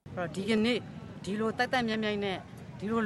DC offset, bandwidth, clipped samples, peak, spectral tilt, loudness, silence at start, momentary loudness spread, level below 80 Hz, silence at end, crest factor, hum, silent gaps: under 0.1%; 12 kHz; under 0.1%; -14 dBFS; -5.5 dB/octave; -32 LUFS; 0.05 s; 13 LU; -60 dBFS; 0 s; 18 dB; none; none